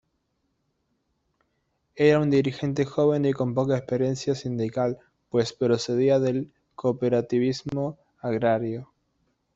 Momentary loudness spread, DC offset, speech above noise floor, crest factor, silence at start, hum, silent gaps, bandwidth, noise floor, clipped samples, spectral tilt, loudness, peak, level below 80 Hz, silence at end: 9 LU; under 0.1%; 51 dB; 18 dB; 1.95 s; none; none; 8 kHz; -75 dBFS; under 0.1%; -7 dB/octave; -25 LUFS; -8 dBFS; -62 dBFS; 0.7 s